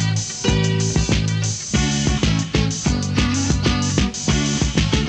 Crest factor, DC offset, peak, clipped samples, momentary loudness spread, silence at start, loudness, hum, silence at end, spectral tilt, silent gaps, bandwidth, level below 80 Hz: 16 dB; under 0.1%; -4 dBFS; under 0.1%; 2 LU; 0 s; -19 LUFS; none; 0 s; -4.5 dB/octave; none; 9.8 kHz; -28 dBFS